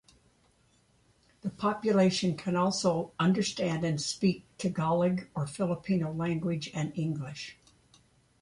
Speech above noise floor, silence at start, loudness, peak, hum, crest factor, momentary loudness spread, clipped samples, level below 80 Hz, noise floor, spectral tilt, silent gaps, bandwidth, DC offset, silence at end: 38 dB; 1.45 s; -30 LUFS; -14 dBFS; none; 18 dB; 9 LU; under 0.1%; -64 dBFS; -67 dBFS; -5.5 dB/octave; none; 11.5 kHz; under 0.1%; 0.9 s